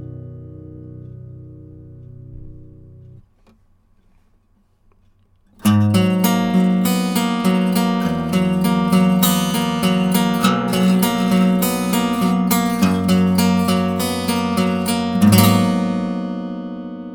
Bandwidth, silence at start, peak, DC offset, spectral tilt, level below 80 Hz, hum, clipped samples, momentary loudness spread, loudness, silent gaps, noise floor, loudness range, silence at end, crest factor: over 20 kHz; 0 s; 0 dBFS; under 0.1%; -5.5 dB/octave; -48 dBFS; none; under 0.1%; 19 LU; -17 LUFS; none; -58 dBFS; 4 LU; 0 s; 18 dB